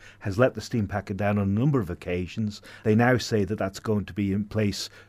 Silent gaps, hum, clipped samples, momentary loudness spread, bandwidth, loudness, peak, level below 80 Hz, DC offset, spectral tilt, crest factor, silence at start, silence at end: none; none; under 0.1%; 9 LU; 15.5 kHz; -26 LUFS; -8 dBFS; -56 dBFS; under 0.1%; -6.5 dB/octave; 18 dB; 0 s; 0.1 s